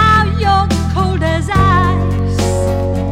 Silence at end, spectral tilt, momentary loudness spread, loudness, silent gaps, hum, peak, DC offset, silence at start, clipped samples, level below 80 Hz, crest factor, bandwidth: 0 s; -6 dB/octave; 5 LU; -14 LUFS; none; none; -2 dBFS; under 0.1%; 0 s; under 0.1%; -22 dBFS; 10 dB; 13 kHz